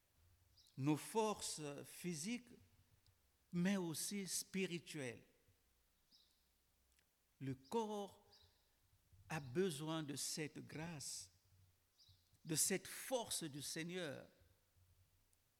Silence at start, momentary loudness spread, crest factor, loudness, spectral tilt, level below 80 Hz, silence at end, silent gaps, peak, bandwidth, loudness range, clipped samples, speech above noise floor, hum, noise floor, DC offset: 0.6 s; 11 LU; 20 dB; -45 LUFS; -4 dB/octave; -80 dBFS; 1.35 s; none; -26 dBFS; 19 kHz; 7 LU; under 0.1%; 35 dB; none; -80 dBFS; under 0.1%